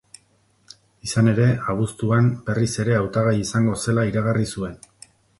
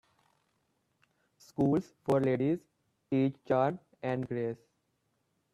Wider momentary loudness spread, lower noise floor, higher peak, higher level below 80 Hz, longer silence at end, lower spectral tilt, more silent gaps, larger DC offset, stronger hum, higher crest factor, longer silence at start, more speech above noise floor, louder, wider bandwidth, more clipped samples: about the same, 7 LU vs 9 LU; second, -62 dBFS vs -78 dBFS; first, -4 dBFS vs -14 dBFS; first, -48 dBFS vs -70 dBFS; second, 0.65 s vs 1 s; second, -6.5 dB/octave vs -8.5 dB/octave; neither; neither; neither; about the same, 16 dB vs 18 dB; second, 1.05 s vs 1.6 s; second, 42 dB vs 48 dB; first, -21 LUFS vs -32 LUFS; about the same, 11.5 kHz vs 11.5 kHz; neither